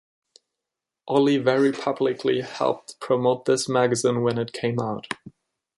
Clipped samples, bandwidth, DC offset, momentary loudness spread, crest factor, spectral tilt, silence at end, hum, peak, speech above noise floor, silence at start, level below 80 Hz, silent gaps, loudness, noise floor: under 0.1%; 11.5 kHz; under 0.1%; 9 LU; 18 dB; -5 dB/octave; 0.5 s; none; -6 dBFS; 64 dB; 1.05 s; -66 dBFS; none; -23 LUFS; -86 dBFS